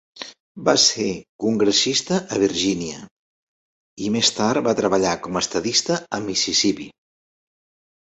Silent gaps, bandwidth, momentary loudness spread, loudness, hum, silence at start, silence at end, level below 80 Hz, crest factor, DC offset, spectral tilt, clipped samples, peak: 0.40-0.55 s, 1.29-1.39 s, 3.11-3.96 s; 8.2 kHz; 14 LU; -20 LUFS; none; 0.15 s; 1.1 s; -56 dBFS; 20 dB; under 0.1%; -3 dB/octave; under 0.1%; -2 dBFS